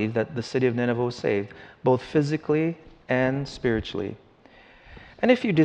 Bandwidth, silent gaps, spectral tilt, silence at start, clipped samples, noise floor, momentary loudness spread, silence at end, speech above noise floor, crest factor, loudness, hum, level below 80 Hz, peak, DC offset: 9.2 kHz; none; -7 dB/octave; 0 s; under 0.1%; -53 dBFS; 9 LU; 0 s; 29 dB; 18 dB; -25 LUFS; none; -52 dBFS; -6 dBFS; under 0.1%